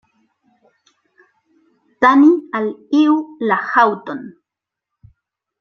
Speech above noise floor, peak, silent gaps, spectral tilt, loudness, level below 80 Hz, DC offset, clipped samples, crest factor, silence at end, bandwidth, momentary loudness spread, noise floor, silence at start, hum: 70 dB; -2 dBFS; none; -6 dB/octave; -15 LUFS; -64 dBFS; under 0.1%; under 0.1%; 18 dB; 1.3 s; 6.6 kHz; 14 LU; -84 dBFS; 2 s; none